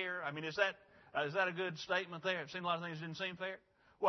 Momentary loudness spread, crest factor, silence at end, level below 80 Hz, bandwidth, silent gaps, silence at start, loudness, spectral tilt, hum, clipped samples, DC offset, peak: 9 LU; 22 dB; 0 s; -82 dBFS; 6.2 kHz; none; 0 s; -39 LUFS; -2 dB/octave; none; under 0.1%; under 0.1%; -18 dBFS